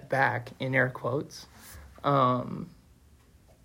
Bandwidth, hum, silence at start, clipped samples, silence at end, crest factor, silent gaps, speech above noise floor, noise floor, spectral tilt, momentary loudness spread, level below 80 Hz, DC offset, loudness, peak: 16 kHz; none; 0 s; under 0.1%; 0.95 s; 20 dB; none; 30 dB; -58 dBFS; -6.5 dB/octave; 21 LU; -60 dBFS; under 0.1%; -28 LUFS; -10 dBFS